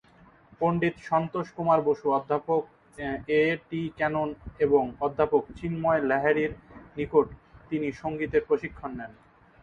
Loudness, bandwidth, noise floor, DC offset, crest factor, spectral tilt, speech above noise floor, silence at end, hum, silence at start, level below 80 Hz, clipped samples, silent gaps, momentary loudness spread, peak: -27 LUFS; 6.8 kHz; -57 dBFS; under 0.1%; 20 dB; -8 dB/octave; 30 dB; 0.5 s; none; 0.6 s; -54 dBFS; under 0.1%; none; 12 LU; -8 dBFS